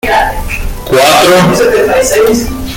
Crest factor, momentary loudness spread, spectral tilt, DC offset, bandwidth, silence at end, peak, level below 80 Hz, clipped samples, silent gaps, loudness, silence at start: 8 dB; 11 LU; -4 dB/octave; under 0.1%; 17.5 kHz; 0 s; 0 dBFS; -22 dBFS; 0.2%; none; -8 LUFS; 0.05 s